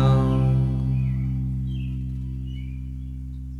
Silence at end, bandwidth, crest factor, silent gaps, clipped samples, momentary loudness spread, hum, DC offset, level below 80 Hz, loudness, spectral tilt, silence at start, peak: 0 s; 4.5 kHz; 14 dB; none; under 0.1%; 14 LU; none; under 0.1%; -32 dBFS; -26 LUFS; -9.5 dB/octave; 0 s; -8 dBFS